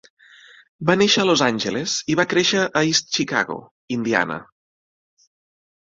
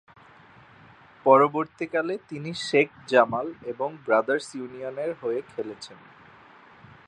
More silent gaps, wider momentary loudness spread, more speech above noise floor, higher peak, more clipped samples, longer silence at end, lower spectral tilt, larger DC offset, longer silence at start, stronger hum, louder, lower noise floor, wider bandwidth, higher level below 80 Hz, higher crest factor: first, 3.71-3.88 s vs none; second, 11 LU vs 16 LU; about the same, 29 dB vs 27 dB; about the same, -2 dBFS vs -4 dBFS; neither; first, 1.5 s vs 1.15 s; second, -3.5 dB/octave vs -5 dB/octave; neither; second, 0.8 s vs 1.25 s; neither; first, -19 LUFS vs -25 LUFS; second, -48 dBFS vs -52 dBFS; second, 7.8 kHz vs 10.5 kHz; first, -60 dBFS vs -70 dBFS; about the same, 20 dB vs 22 dB